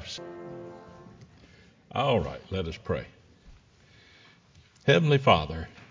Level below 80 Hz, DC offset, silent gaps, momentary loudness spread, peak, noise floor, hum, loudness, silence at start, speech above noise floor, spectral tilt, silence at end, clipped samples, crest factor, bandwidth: -48 dBFS; under 0.1%; none; 23 LU; -6 dBFS; -58 dBFS; none; -27 LUFS; 0 s; 32 dB; -6.5 dB/octave; 0.05 s; under 0.1%; 24 dB; 7.6 kHz